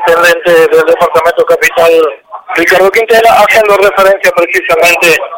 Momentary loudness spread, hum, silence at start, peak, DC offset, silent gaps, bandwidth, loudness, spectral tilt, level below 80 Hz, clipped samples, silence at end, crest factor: 5 LU; none; 0 s; 0 dBFS; under 0.1%; none; 17 kHz; -6 LUFS; -2.5 dB/octave; -42 dBFS; 1%; 0 s; 6 dB